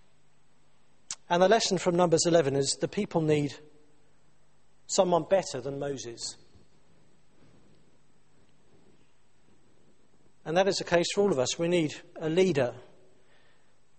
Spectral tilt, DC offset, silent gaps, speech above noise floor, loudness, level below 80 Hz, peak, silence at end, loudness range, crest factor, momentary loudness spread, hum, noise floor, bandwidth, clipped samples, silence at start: -4.5 dB/octave; 0.2%; none; 41 dB; -27 LUFS; -64 dBFS; -8 dBFS; 1.15 s; 11 LU; 22 dB; 13 LU; none; -68 dBFS; 8.8 kHz; under 0.1%; 1.1 s